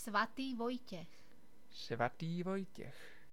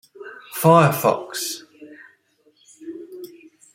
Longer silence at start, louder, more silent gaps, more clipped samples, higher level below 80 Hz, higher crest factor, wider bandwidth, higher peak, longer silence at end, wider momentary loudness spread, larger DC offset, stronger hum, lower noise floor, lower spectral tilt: second, 0 s vs 0.2 s; second, -42 LUFS vs -18 LUFS; neither; neither; second, -74 dBFS vs -64 dBFS; about the same, 20 dB vs 22 dB; about the same, 17 kHz vs 16.5 kHz; second, -22 dBFS vs -2 dBFS; second, 0.1 s vs 0.5 s; second, 17 LU vs 25 LU; first, 0.3% vs under 0.1%; neither; first, -67 dBFS vs -61 dBFS; about the same, -5.5 dB/octave vs -5.5 dB/octave